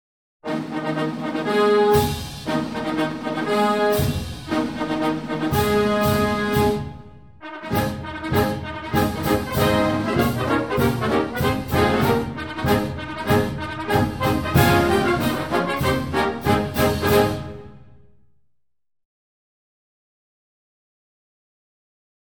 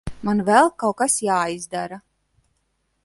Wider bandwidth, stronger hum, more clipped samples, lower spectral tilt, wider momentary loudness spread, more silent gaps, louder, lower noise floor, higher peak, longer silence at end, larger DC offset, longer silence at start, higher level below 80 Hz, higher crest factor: first, 19.5 kHz vs 12 kHz; neither; neither; first, -6 dB/octave vs -4 dB/octave; second, 10 LU vs 14 LU; neither; about the same, -21 LUFS vs -20 LUFS; about the same, -73 dBFS vs -70 dBFS; about the same, -2 dBFS vs -2 dBFS; first, 4.45 s vs 1.05 s; first, 0.3% vs under 0.1%; first, 0.45 s vs 0.05 s; first, -40 dBFS vs -50 dBFS; about the same, 20 dB vs 20 dB